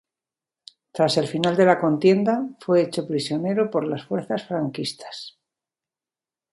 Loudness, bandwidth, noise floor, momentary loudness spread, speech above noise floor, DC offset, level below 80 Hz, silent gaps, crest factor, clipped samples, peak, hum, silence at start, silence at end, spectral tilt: -22 LUFS; 11.5 kHz; under -90 dBFS; 14 LU; over 68 dB; under 0.1%; -68 dBFS; none; 20 dB; under 0.1%; -2 dBFS; none; 0.95 s; 1.25 s; -6 dB/octave